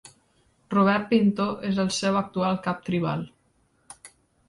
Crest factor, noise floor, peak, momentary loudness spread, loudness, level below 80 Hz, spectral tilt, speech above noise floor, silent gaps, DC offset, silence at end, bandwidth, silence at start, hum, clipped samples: 20 dB; -66 dBFS; -6 dBFS; 20 LU; -25 LUFS; -60 dBFS; -5.5 dB/octave; 42 dB; none; under 0.1%; 0.4 s; 11.5 kHz; 0.05 s; none; under 0.1%